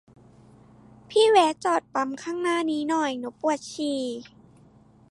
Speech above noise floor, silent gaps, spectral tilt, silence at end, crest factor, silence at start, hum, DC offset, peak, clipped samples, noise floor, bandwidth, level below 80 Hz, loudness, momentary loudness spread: 31 dB; none; -3 dB/octave; 0.9 s; 20 dB; 1.1 s; none; under 0.1%; -6 dBFS; under 0.1%; -55 dBFS; 11.5 kHz; -68 dBFS; -25 LUFS; 11 LU